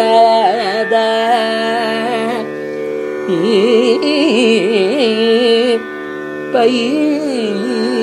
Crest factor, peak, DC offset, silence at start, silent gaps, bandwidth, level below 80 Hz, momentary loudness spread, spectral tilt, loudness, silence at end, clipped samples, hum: 14 dB; 0 dBFS; under 0.1%; 0 s; none; 12 kHz; -66 dBFS; 10 LU; -4.5 dB/octave; -14 LUFS; 0 s; under 0.1%; none